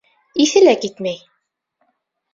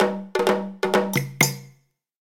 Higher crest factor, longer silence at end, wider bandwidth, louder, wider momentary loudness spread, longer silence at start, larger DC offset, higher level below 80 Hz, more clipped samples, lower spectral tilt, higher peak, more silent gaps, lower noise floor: second, 16 dB vs 22 dB; first, 1.2 s vs 0.55 s; second, 7.6 kHz vs 17.5 kHz; first, -16 LUFS vs -22 LUFS; first, 14 LU vs 4 LU; first, 0.35 s vs 0 s; neither; about the same, -64 dBFS vs -64 dBFS; neither; about the same, -3.5 dB/octave vs -4 dB/octave; about the same, -2 dBFS vs -2 dBFS; neither; first, -71 dBFS vs -59 dBFS